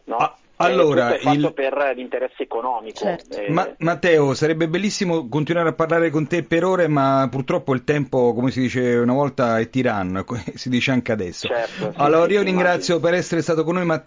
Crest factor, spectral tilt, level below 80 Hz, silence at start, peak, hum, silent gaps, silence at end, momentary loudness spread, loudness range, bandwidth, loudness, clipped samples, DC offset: 16 dB; -6 dB/octave; -54 dBFS; 0.05 s; -4 dBFS; none; none; 0.05 s; 9 LU; 2 LU; 7.6 kHz; -20 LUFS; under 0.1%; under 0.1%